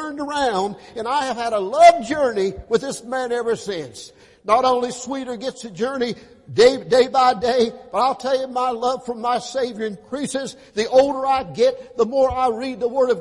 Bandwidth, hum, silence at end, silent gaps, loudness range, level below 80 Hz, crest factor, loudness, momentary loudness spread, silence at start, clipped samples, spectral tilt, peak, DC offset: 11.5 kHz; none; 0 s; none; 4 LU; -52 dBFS; 18 dB; -20 LUFS; 12 LU; 0 s; under 0.1%; -4 dB/octave; -2 dBFS; under 0.1%